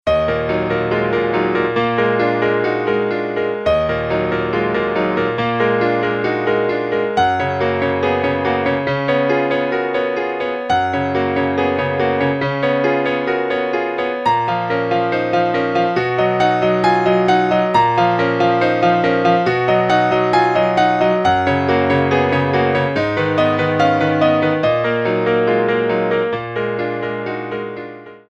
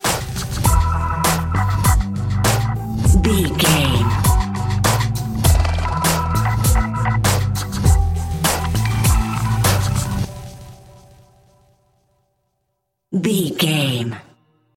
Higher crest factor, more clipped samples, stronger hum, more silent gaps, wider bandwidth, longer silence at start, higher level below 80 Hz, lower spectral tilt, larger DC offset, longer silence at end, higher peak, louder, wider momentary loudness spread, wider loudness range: about the same, 14 dB vs 16 dB; neither; neither; neither; second, 8.4 kHz vs 17 kHz; about the same, 0.05 s vs 0 s; second, -46 dBFS vs -24 dBFS; first, -7 dB/octave vs -4.5 dB/octave; neither; second, 0.15 s vs 0.55 s; about the same, -2 dBFS vs -2 dBFS; about the same, -17 LUFS vs -18 LUFS; about the same, 5 LU vs 7 LU; second, 3 LU vs 7 LU